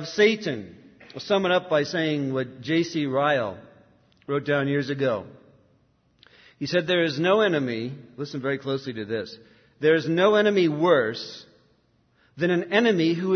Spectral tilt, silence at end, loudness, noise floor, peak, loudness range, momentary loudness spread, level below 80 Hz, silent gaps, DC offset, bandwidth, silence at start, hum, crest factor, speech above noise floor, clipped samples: -6 dB/octave; 0 s; -24 LUFS; -64 dBFS; -8 dBFS; 4 LU; 15 LU; -70 dBFS; none; under 0.1%; 6.6 kHz; 0 s; none; 18 dB; 41 dB; under 0.1%